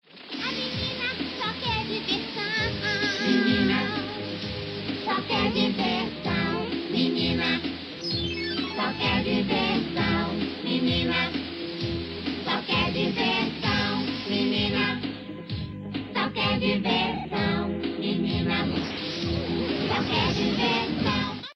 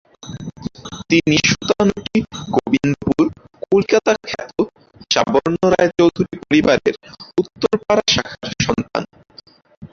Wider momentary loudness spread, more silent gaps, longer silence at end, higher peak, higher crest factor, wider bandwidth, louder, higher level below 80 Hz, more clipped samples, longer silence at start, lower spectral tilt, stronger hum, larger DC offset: second, 8 LU vs 16 LU; second, none vs 9.77-9.82 s; about the same, 0.05 s vs 0.05 s; second, -10 dBFS vs -2 dBFS; about the same, 16 dB vs 16 dB; first, 9.2 kHz vs 7.4 kHz; second, -26 LUFS vs -17 LUFS; about the same, -48 dBFS vs -46 dBFS; neither; about the same, 0.15 s vs 0.25 s; first, -6 dB/octave vs -4.5 dB/octave; neither; neither